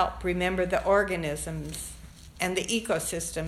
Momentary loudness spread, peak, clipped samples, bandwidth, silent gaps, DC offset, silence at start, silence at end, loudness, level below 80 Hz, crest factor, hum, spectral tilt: 13 LU; -10 dBFS; under 0.1%; 15 kHz; none; under 0.1%; 0 s; 0 s; -28 LUFS; -44 dBFS; 18 dB; none; -4 dB/octave